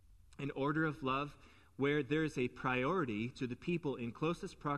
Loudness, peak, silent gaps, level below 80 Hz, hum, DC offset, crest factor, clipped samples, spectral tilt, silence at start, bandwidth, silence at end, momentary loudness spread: -38 LUFS; -22 dBFS; none; -64 dBFS; none; under 0.1%; 16 dB; under 0.1%; -7 dB/octave; 0.1 s; 12 kHz; 0 s; 7 LU